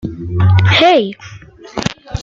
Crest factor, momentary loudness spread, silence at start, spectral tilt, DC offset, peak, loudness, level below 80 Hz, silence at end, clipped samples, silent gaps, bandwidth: 14 dB; 16 LU; 0.05 s; -6 dB/octave; under 0.1%; 0 dBFS; -13 LUFS; -38 dBFS; 0 s; under 0.1%; none; 7.4 kHz